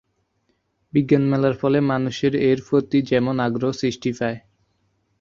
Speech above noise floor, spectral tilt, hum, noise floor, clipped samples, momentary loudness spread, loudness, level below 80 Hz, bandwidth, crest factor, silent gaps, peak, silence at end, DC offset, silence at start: 49 dB; -7 dB/octave; none; -69 dBFS; under 0.1%; 6 LU; -21 LUFS; -56 dBFS; 7.4 kHz; 18 dB; none; -4 dBFS; 0.8 s; under 0.1%; 0.95 s